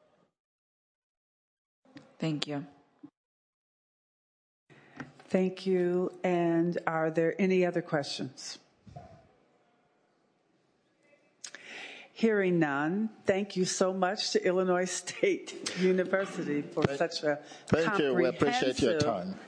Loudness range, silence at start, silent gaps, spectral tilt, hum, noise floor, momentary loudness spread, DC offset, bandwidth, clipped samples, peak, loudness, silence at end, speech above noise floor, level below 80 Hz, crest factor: 12 LU; 1.95 s; 3.17-4.67 s; -5 dB/octave; none; -71 dBFS; 16 LU; under 0.1%; 10.5 kHz; under 0.1%; -8 dBFS; -30 LUFS; 0 s; 42 dB; -66 dBFS; 24 dB